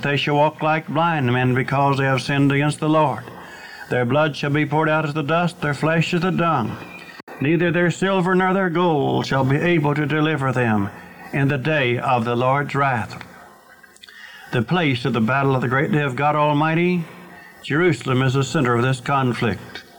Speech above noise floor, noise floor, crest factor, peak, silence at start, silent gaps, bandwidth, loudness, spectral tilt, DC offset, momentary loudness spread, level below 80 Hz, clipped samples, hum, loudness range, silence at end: 29 dB; -48 dBFS; 12 dB; -8 dBFS; 0 s; 7.23-7.27 s; 19.5 kHz; -19 LUFS; -6.5 dB/octave; under 0.1%; 12 LU; -56 dBFS; under 0.1%; none; 3 LU; 0.15 s